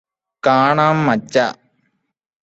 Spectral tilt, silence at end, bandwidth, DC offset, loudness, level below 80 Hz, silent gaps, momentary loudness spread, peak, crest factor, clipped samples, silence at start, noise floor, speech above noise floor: -6 dB/octave; 0.9 s; 8.2 kHz; under 0.1%; -16 LUFS; -60 dBFS; none; 7 LU; -2 dBFS; 16 dB; under 0.1%; 0.45 s; -67 dBFS; 52 dB